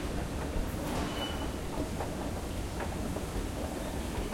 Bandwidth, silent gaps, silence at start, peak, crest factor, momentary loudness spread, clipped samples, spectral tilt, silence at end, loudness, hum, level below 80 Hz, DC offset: 16.5 kHz; none; 0 s; -20 dBFS; 14 dB; 2 LU; under 0.1%; -5 dB/octave; 0 s; -36 LUFS; none; -40 dBFS; under 0.1%